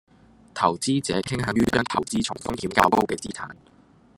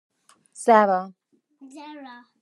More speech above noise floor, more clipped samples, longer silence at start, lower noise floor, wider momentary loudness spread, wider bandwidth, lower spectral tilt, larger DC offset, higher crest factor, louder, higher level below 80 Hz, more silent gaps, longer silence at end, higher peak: second, 22 dB vs 30 dB; neither; about the same, 0.55 s vs 0.6 s; second, -46 dBFS vs -52 dBFS; second, 14 LU vs 25 LU; first, 16.5 kHz vs 12 kHz; about the same, -4.5 dB/octave vs -5 dB/octave; neither; about the same, 24 dB vs 22 dB; second, -24 LUFS vs -20 LUFS; first, -52 dBFS vs -88 dBFS; neither; first, 0.65 s vs 0.35 s; about the same, 0 dBFS vs -2 dBFS